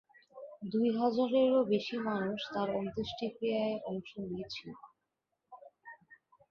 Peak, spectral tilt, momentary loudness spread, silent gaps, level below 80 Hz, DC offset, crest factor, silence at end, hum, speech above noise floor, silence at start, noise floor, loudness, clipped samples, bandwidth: -18 dBFS; -7 dB/octave; 23 LU; none; -70 dBFS; under 0.1%; 18 dB; 0.35 s; none; 52 dB; 0.35 s; -85 dBFS; -34 LUFS; under 0.1%; 7 kHz